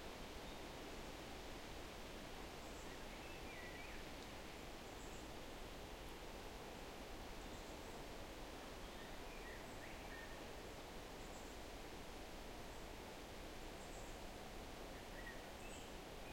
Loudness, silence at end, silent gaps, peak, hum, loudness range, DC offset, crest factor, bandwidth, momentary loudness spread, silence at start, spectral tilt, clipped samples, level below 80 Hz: -53 LUFS; 0 s; none; -40 dBFS; none; 1 LU; under 0.1%; 14 dB; 16.5 kHz; 1 LU; 0 s; -3.5 dB/octave; under 0.1%; -58 dBFS